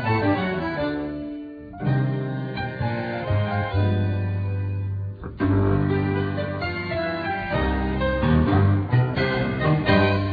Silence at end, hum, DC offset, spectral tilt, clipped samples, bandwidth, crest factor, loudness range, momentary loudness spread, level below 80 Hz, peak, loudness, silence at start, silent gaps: 0 s; none; under 0.1%; -10 dB/octave; under 0.1%; 5 kHz; 18 dB; 4 LU; 10 LU; -36 dBFS; -6 dBFS; -23 LUFS; 0 s; none